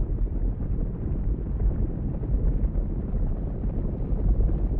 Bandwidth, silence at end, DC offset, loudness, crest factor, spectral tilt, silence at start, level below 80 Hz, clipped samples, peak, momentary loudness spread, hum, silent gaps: 2.2 kHz; 0 s; under 0.1%; -29 LUFS; 12 dB; -13.5 dB/octave; 0 s; -26 dBFS; under 0.1%; -12 dBFS; 4 LU; none; none